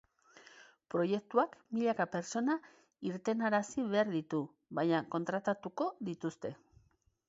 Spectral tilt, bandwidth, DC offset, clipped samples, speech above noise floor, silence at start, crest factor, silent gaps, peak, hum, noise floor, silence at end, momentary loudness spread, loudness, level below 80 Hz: -5 dB/octave; 7.6 kHz; under 0.1%; under 0.1%; 38 dB; 0.55 s; 20 dB; none; -16 dBFS; none; -72 dBFS; 0.75 s; 8 LU; -36 LUFS; -78 dBFS